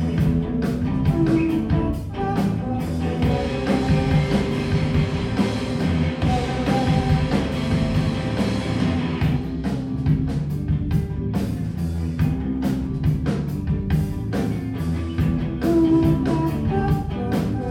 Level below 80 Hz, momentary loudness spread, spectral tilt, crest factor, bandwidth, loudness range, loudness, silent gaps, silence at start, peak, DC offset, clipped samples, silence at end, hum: -32 dBFS; 6 LU; -7.5 dB/octave; 14 dB; 15 kHz; 2 LU; -22 LUFS; none; 0 s; -6 dBFS; under 0.1%; under 0.1%; 0 s; none